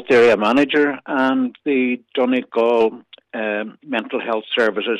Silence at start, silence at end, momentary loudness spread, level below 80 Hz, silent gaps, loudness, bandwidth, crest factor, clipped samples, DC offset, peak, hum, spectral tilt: 0 s; 0 s; 10 LU; -62 dBFS; none; -18 LUFS; 9.6 kHz; 12 dB; under 0.1%; under 0.1%; -6 dBFS; none; -5.5 dB/octave